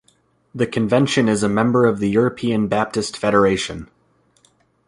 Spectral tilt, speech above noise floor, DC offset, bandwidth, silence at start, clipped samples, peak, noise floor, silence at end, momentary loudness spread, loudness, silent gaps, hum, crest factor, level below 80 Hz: -5.5 dB/octave; 43 dB; under 0.1%; 11.5 kHz; 0.55 s; under 0.1%; -2 dBFS; -60 dBFS; 1 s; 8 LU; -18 LUFS; none; none; 16 dB; -50 dBFS